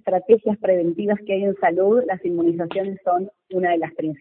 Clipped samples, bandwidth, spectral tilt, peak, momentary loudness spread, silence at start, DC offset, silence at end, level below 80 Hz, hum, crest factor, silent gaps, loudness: under 0.1%; 4 kHz; -11.5 dB/octave; -2 dBFS; 7 LU; 0.05 s; under 0.1%; 0.05 s; -66 dBFS; none; 18 dB; none; -21 LUFS